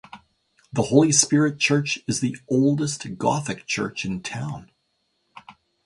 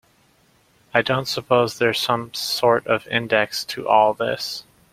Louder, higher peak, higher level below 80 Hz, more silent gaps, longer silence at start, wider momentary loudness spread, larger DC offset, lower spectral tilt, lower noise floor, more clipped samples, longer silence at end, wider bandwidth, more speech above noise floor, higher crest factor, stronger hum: about the same, -22 LUFS vs -20 LUFS; about the same, -2 dBFS vs 0 dBFS; about the same, -58 dBFS vs -60 dBFS; neither; second, 0.15 s vs 0.95 s; first, 14 LU vs 7 LU; neither; about the same, -4 dB/octave vs -4 dB/octave; first, -72 dBFS vs -59 dBFS; neither; about the same, 0.35 s vs 0.3 s; second, 11.5 kHz vs 16 kHz; first, 50 dB vs 38 dB; about the same, 22 dB vs 20 dB; neither